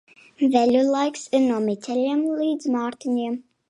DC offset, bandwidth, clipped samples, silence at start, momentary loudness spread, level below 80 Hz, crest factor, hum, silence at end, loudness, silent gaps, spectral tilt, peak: under 0.1%; 11 kHz; under 0.1%; 0.4 s; 7 LU; -70 dBFS; 18 dB; none; 0.3 s; -22 LUFS; none; -5 dB/octave; -4 dBFS